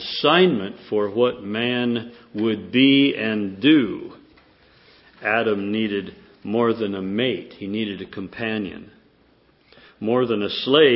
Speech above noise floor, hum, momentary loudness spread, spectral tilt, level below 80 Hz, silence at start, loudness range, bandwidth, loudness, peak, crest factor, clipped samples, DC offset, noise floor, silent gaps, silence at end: 37 dB; none; 15 LU; -10 dB/octave; -60 dBFS; 0 s; 7 LU; 5.8 kHz; -21 LUFS; -2 dBFS; 20 dB; under 0.1%; under 0.1%; -58 dBFS; none; 0 s